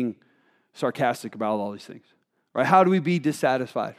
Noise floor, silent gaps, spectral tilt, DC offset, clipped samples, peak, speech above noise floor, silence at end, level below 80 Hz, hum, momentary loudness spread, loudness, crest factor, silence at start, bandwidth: -63 dBFS; none; -6.5 dB/octave; under 0.1%; under 0.1%; -4 dBFS; 40 dB; 0.05 s; -80 dBFS; none; 15 LU; -24 LUFS; 20 dB; 0 s; 15 kHz